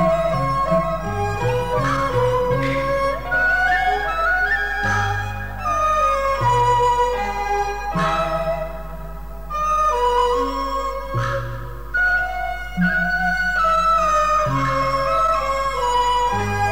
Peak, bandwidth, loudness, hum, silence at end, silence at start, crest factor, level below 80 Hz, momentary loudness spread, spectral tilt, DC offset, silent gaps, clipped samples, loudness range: -6 dBFS; 19.5 kHz; -19 LUFS; none; 0 s; 0 s; 12 dB; -34 dBFS; 8 LU; -5 dB/octave; 2%; none; under 0.1%; 3 LU